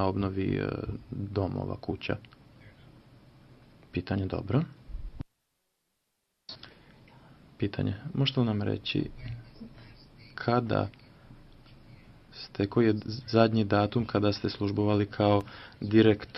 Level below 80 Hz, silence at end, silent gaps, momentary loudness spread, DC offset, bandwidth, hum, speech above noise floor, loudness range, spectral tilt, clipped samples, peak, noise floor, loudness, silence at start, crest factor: -52 dBFS; 0 s; none; 21 LU; under 0.1%; 6 kHz; none; 51 dB; 10 LU; -8.5 dB/octave; under 0.1%; -8 dBFS; -79 dBFS; -29 LUFS; 0 s; 24 dB